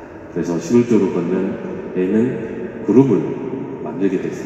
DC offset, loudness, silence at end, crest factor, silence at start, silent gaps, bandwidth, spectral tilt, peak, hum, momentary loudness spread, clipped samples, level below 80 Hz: under 0.1%; -19 LUFS; 0 s; 18 dB; 0 s; none; 8.4 kHz; -8 dB/octave; 0 dBFS; none; 12 LU; under 0.1%; -52 dBFS